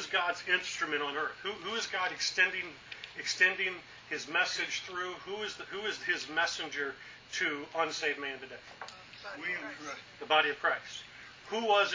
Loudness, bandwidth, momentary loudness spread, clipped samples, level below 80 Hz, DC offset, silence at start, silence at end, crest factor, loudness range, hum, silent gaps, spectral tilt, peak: -32 LUFS; 7.6 kHz; 17 LU; under 0.1%; -72 dBFS; under 0.1%; 0 s; 0 s; 24 dB; 4 LU; none; none; -1 dB/octave; -12 dBFS